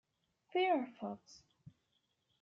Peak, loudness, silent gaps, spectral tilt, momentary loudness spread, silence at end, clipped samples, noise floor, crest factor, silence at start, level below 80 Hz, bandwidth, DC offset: -22 dBFS; -37 LUFS; none; -2.5 dB/octave; 13 LU; 1.05 s; under 0.1%; -82 dBFS; 18 dB; 0.55 s; -86 dBFS; 7.4 kHz; under 0.1%